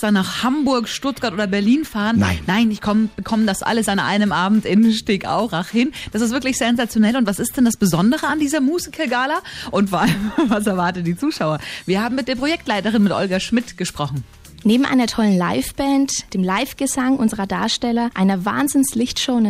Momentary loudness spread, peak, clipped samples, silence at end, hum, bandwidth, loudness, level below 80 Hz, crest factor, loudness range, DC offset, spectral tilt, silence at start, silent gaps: 5 LU; -4 dBFS; under 0.1%; 0 s; none; 15.5 kHz; -19 LUFS; -44 dBFS; 14 dB; 2 LU; under 0.1%; -4.5 dB/octave; 0 s; none